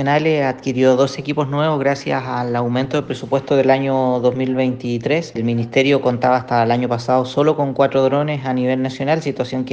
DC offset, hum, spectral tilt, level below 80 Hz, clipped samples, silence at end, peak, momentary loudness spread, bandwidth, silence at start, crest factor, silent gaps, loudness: under 0.1%; none; -7 dB/octave; -58 dBFS; under 0.1%; 0 s; -2 dBFS; 6 LU; 8.4 kHz; 0 s; 16 dB; none; -18 LUFS